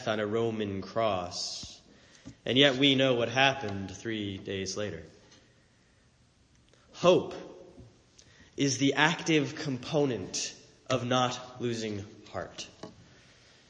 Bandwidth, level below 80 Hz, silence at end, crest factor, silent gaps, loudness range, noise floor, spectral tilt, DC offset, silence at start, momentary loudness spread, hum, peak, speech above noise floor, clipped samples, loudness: 10 kHz; -66 dBFS; 0.7 s; 24 dB; none; 7 LU; -64 dBFS; -4 dB/octave; under 0.1%; 0 s; 18 LU; none; -8 dBFS; 35 dB; under 0.1%; -29 LUFS